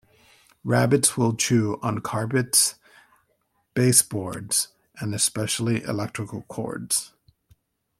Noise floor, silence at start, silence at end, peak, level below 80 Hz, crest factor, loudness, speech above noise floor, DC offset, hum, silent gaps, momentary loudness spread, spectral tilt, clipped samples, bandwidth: -70 dBFS; 0.65 s; 0.9 s; -2 dBFS; -62 dBFS; 22 dB; -23 LUFS; 47 dB; under 0.1%; none; none; 14 LU; -3.5 dB/octave; under 0.1%; 16.5 kHz